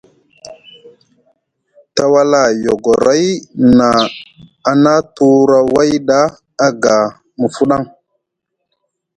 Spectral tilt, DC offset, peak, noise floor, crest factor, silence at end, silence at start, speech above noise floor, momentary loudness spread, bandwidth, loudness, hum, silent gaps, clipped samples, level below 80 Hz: -5 dB/octave; under 0.1%; 0 dBFS; -74 dBFS; 14 dB; 1.3 s; 0.45 s; 63 dB; 10 LU; 11 kHz; -12 LUFS; none; none; under 0.1%; -48 dBFS